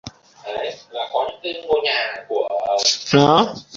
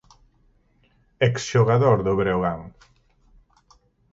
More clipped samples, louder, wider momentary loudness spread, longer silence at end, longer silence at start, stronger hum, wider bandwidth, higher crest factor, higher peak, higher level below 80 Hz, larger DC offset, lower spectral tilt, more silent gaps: neither; about the same, -19 LUFS vs -21 LUFS; first, 14 LU vs 8 LU; second, 0 s vs 1.45 s; second, 0.05 s vs 1.2 s; neither; about the same, 7.8 kHz vs 7.8 kHz; about the same, 20 dB vs 20 dB; first, -2 dBFS vs -6 dBFS; second, -56 dBFS vs -50 dBFS; neither; second, -4 dB/octave vs -6.5 dB/octave; neither